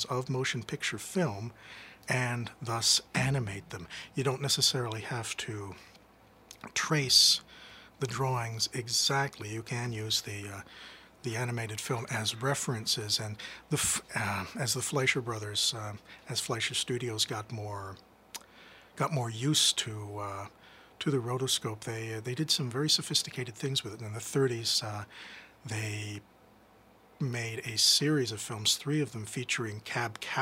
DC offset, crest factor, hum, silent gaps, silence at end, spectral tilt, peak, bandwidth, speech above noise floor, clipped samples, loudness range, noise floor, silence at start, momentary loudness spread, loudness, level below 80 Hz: under 0.1%; 24 dB; none; none; 0 s; -3 dB/octave; -10 dBFS; 16 kHz; 28 dB; under 0.1%; 6 LU; -60 dBFS; 0 s; 17 LU; -30 LUFS; -66 dBFS